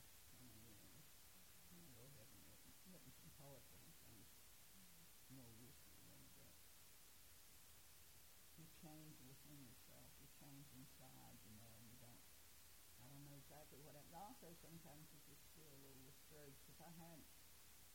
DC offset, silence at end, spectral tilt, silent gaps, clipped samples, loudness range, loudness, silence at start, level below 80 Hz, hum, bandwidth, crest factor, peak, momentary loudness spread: under 0.1%; 0 s; -3.5 dB/octave; none; under 0.1%; 2 LU; -64 LUFS; 0 s; -78 dBFS; none; 16.5 kHz; 18 dB; -46 dBFS; 4 LU